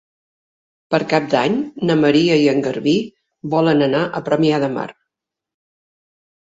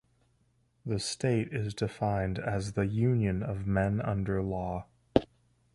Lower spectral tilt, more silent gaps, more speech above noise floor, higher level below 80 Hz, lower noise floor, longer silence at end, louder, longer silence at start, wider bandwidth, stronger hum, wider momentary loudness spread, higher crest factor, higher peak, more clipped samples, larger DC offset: about the same, -6.5 dB/octave vs -6.5 dB/octave; neither; first, 66 dB vs 40 dB; second, -60 dBFS vs -48 dBFS; first, -83 dBFS vs -70 dBFS; first, 1.55 s vs 0.5 s; first, -17 LUFS vs -31 LUFS; about the same, 0.9 s vs 0.85 s; second, 7.8 kHz vs 11.5 kHz; neither; about the same, 9 LU vs 7 LU; second, 18 dB vs 26 dB; first, 0 dBFS vs -6 dBFS; neither; neither